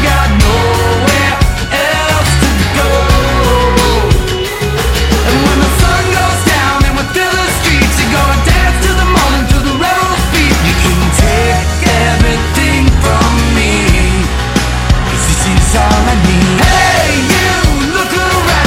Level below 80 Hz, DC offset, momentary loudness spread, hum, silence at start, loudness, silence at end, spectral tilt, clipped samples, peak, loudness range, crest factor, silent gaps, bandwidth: -14 dBFS; under 0.1%; 3 LU; none; 0 s; -10 LUFS; 0 s; -4.5 dB/octave; under 0.1%; 0 dBFS; 1 LU; 10 dB; none; 16.5 kHz